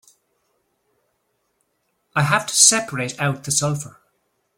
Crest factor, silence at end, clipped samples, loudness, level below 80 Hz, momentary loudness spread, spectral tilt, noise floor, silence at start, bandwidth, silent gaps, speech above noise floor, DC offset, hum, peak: 24 dB; 0.65 s; under 0.1%; -18 LUFS; -60 dBFS; 14 LU; -2 dB/octave; -71 dBFS; 2.15 s; 16.5 kHz; none; 51 dB; under 0.1%; none; 0 dBFS